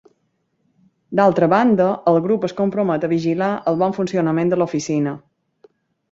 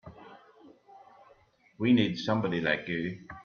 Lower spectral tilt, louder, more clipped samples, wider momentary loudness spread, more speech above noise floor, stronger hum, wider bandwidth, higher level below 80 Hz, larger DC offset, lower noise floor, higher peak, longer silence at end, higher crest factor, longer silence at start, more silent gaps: about the same, -7 dB/octave vs -7 dB/octave; first, -18 LUFS vs -29 LUFS; neither; second, 7 LU vs 11 LU; first, 51 dB vs 34 dB; neither; first, 7.8 kHz vs 6.8 kHz; about the same, -60 dBFS vs -64 dBFS; neither; first, -68 dBFS vs -63 dBFS; first, -2 dBFS vs -12 dBFS; first, 0.9 s vs 0 s; about the same, 16 dB vs 20 dB; first, 1.1 s vs 0.05 s; neither